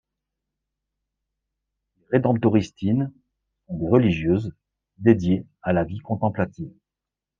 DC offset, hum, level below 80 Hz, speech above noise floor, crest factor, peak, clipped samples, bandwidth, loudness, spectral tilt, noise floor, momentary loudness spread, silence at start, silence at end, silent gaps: under 0.1%; none; -52 dBFS; 66 dB; 22 dB; -2 dBFS; under 0.1%; 7.4 kHz; -23 LUFS; -8.5 dB/octave; -88 dBFS; 12 LU; 2.1 s; 0.7 s; none